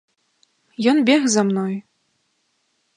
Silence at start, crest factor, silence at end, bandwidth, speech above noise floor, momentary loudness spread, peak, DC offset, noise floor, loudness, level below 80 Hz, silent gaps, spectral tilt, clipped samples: 0.8 s; 18 dB; 1.15 s; 11 kHz; 51 dB; 15 LU; -4 dBFS; under 0.1%; -68 dBFS; -18 LUFS; -72 dBFS; none; -4.5 dB/octave; under 0.1%